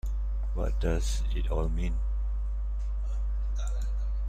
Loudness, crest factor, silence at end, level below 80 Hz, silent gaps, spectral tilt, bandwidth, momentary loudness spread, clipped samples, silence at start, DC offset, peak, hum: -33 LUFS; 14 dB; 0 s; -28 dBFS; none; -6 dB/octave; 9.2 kHz; 5 LU; under 0.1%; 0.05 s; under 0.1%; -14 dBFS; none